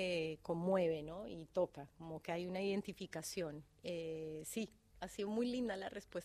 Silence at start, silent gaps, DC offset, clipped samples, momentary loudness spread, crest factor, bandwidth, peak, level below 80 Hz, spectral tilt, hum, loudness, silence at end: 0 s; none; under 0.1%; under 0.1%; 12 LU; 18 dB; 15.5 kHz; -24 dBFS; -70 dBFS; -5 dB/octave; none; -43 LUFS; 0 s